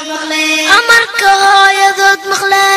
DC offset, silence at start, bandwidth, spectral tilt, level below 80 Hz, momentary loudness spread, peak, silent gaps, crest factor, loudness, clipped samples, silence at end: under 0.1%; 0 s; 16 kHz; 0.5 dB/octave; -52 dBFS; 6 LU; 0 dBFS; none; 10 dB; -8 LUFS; 0.4%; 0 s